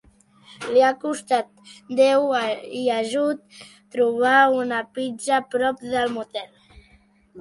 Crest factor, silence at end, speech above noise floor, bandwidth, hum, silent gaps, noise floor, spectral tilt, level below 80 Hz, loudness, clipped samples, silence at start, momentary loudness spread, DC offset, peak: 18 dB; 0 s; 35 dB; 11.5 kHz; none; none; -57 dBFS; -3.5 dB/octave; -62 dBFS; -21 LUFS; under 0.1%; 0.6 s; 16 LU; under 0.1%; -6 dBFS